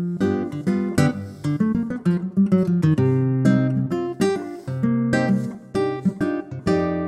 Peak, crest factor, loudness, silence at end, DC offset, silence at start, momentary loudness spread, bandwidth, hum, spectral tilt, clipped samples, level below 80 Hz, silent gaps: -4 dBFS; 16 dB; -22 LUFS; 0 s; under 0.1%; 0 s; 7 LU; 12.5 kHz; none; -8 dB/octave; under 0.1%; -52 dBFS; none